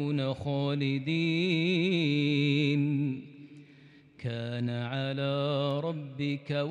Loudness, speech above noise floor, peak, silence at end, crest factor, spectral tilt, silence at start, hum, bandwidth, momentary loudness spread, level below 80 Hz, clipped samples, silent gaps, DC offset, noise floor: -30 LUFS; 27 dB; -16 dBFS; 0 s; 14 dB; -7.5 dB/octave; 0 s; none; 8.4 kHz; 8 LU; -72 dBFS; under 0.1%; none; under 0.1%; -56 dBFS